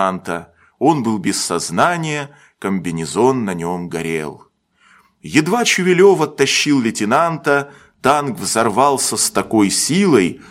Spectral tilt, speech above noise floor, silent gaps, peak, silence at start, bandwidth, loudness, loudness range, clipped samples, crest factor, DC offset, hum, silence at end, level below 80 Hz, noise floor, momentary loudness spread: -4 dB/octave; 37 dB; none; 0 dBFS; 0 s; 16.5 kHz; -16 LUFS; 5 LU; under 0.1%; 16 dB; under 0.1%; none; 0.1 s; -56 dBFS; -53 dBFS; 10 LU